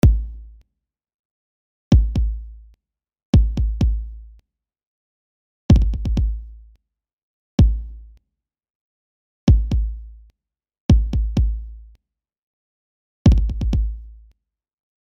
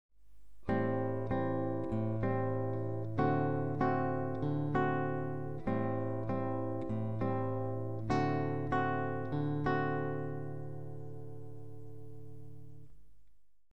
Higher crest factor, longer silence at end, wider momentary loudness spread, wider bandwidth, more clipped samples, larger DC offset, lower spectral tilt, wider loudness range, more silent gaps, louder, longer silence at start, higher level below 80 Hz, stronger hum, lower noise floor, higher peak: about the same, 20 dB vs 18 dB; first, 1.05 s vs 0 s; about the same, 18 LU vs 17 LU; about the same, 6.6 kHz vs 6.8 kHz; neither; second, under 0.1% vs 0.7%; about the same, -8.5 dB/octave vs -9.5 dB/octave; second, 3 LU vs 6 LU; first, 1.14-1.91 s, 3.25-3.33 s, 4.87-5.69 s, 7.13-7.58 s, 8.70-9.47 s, 10.80-10.89 s, 12.38-13.25 s vs none; first, -20 LUFS vs -35 LUFS; about the same, 0.05 s vs 0.1 s; first, -24 dBFS vs -58 dBFS; neither; first, -81 dBFS vs -62 dBFS; first, -2 dBFS vs -18 dBFS